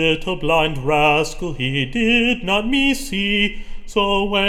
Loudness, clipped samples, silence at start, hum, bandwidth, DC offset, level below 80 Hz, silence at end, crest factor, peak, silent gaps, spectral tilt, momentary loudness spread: -18 LUFS; under 0.1%; 0 s; none; 16.5 kHz; under 0.1%; -32 dBFS; 0 s; 16 dB; -4 dBFS; none; -4.5 dB/octave; 7 LU